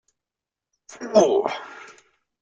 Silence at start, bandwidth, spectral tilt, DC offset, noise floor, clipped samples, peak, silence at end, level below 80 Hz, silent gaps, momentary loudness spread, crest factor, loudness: 0.9 s; 7.8 kHz; -4.5 dB/octave; under 0.1%; -88 dBFS; under 0.1%; -4 dBFS; 0.6 s; -68 dBFS; none; 23 LU; 22 dB; -20 LUFS